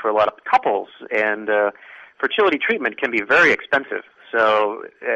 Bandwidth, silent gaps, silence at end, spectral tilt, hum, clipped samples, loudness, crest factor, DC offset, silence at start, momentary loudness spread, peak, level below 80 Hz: 8.4 kHz; none; 0 s; -4 dB/octave; none; under 0.1%; -19 LUFS; 14 dB; under 0.1%; 0 s; 11 LU; -4 dBFS; -62 dBFS